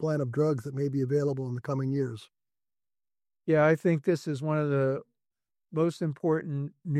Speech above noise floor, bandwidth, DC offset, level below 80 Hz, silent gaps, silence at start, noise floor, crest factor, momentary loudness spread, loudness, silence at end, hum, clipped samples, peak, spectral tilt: over 62 dB; 12 kHz; under 0.1%; -70 dBFS; none; 0 s; under -90 dBFS; 18 dB; 11 LU; -29 LUFS; 0 s; none; under 0.1%; -12 dBFS; -8.5 dB/octave